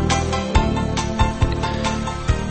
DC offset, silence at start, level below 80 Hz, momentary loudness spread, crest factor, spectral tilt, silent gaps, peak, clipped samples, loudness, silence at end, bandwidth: under 0.1%; 0 s; -24 dBFS; 3 LU; 18 dB; -5 dB/octave; none; -2 dBFS; under 0.1%; -21 LUFS; 0 s; 8.8 kHz